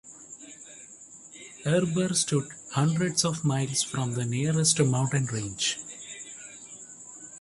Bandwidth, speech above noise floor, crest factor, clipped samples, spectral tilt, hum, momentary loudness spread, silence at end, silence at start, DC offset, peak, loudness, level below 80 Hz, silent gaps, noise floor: 11.5 kHz; 23 dB; 22 dB; under 0.1%; -4 dB/octave; none; 20 LU; 0 s; 0.05 s; under 0.1%; -8 dBFS; -26 LUFS; -62 dBFS; none; -49 dBFS